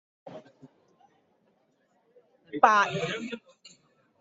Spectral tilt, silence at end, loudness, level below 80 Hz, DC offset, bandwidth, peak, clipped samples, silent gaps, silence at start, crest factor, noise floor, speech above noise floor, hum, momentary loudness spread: -2 dB/octave; 0.85 s; -25 LUFS; -76 dBFS; under 0.1%; 8 kHz; -4 dBFS; under 0.1%; none; 0.25 s; 28 dB; -70 dBFS; 45 dB; none; 27 LU